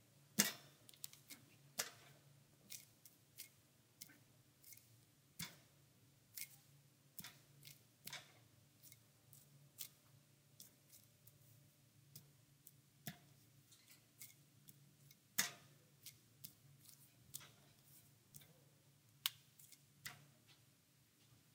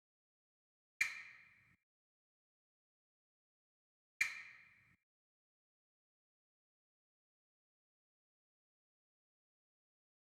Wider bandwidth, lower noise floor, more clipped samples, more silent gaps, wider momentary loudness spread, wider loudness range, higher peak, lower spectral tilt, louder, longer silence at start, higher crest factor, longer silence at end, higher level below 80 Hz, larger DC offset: first, 18 kHz vs 9.6 kHz; first, -74 dBFS vs -67 dBFS; neither; second, none vs 1.83-4.20 s; about the same, 23 LU vs 21 LU; first, 11 LU vs 0 LU; first, -14 dBFS vs -20 dBFS; first, -1 dB/octave vs 1.5 dB/octave; second, -49 LUFS vs -41 LUFS; second, 0 s vs 1 s; first, 40 dB vs 34 dB; second, 0 s vs 5.6 s; about the same, under -90 dBFS vs under -90 dBFS; neither